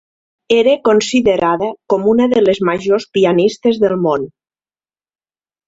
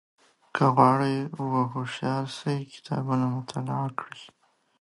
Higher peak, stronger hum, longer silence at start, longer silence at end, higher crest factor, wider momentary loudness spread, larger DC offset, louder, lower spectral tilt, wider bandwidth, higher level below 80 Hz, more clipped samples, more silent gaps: first, 0 dBFS vs -4 dBFS; neither; about the same, 0.5 s vs 0.55 s; first, 1.4 s vs 0.55 s; second, 14 dB vs 22 dB; second, 6 LU vs 13 LU; neither; first, -14 LUFS vs -27 LUFS; second, -5.5 dB/octave vs -7 dB/octave; second, 8 kHz vs 11.5 kHz; first, -52 dBFS vs -70 dBFS; neither; neither